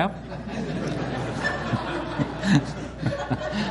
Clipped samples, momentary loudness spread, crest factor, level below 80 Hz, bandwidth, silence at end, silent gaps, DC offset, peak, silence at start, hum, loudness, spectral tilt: under 0.1%; 9 LU; 20 dB; -44 dBFS; 11.5 kHz; 0 s; none; under 0.1%; -6 dBFS; 0 s; none; -27 LUFS; -6 dB/octave